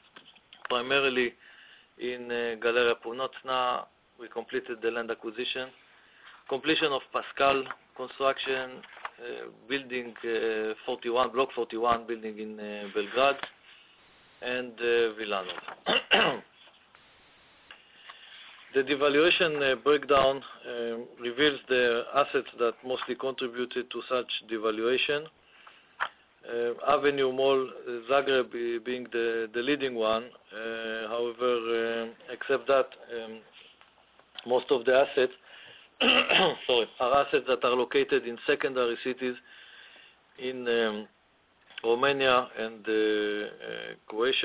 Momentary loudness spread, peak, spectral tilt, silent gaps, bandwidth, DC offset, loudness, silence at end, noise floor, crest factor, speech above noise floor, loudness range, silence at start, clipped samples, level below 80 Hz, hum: 16 LU; -8 dBFS; -7.5 dB/octave; none; 4 kHz; under 0.1%; -28 LUFS; 0 s; -65 dBFS; 22 dB; 37 dB; 6 LU; 0.7 s; under 0.1%; -66 dBFS; none